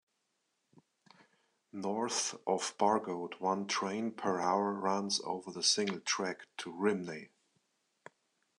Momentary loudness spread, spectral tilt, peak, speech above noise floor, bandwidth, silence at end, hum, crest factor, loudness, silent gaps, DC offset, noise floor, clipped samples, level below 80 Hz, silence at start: 10 LU; -3 dB/octave; -14 dBFS; 47 dB; 12 kHz; 1.3 s; none; 22 dB; -34 LUFS; none; under 0.1%; -82 dBFS; under 0.1%; -84 dBFS; 1.75 s